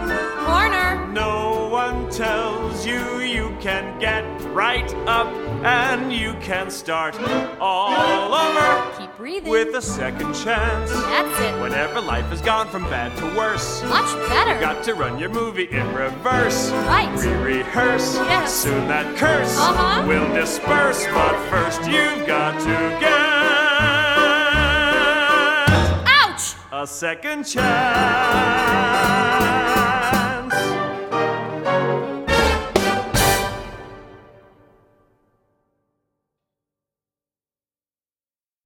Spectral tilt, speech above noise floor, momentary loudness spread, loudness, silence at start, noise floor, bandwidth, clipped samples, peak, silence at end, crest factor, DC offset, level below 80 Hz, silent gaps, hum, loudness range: -3.5 dB/octave; over 70 dB; 9 LU; -19 LUFS; 0 s; under -90 dBFS; 18 kHz; under 0.1%; -2 dBFS; 4.45 s; 18 dB; under 0.1%; -36 dBFS; none; none; 6 LU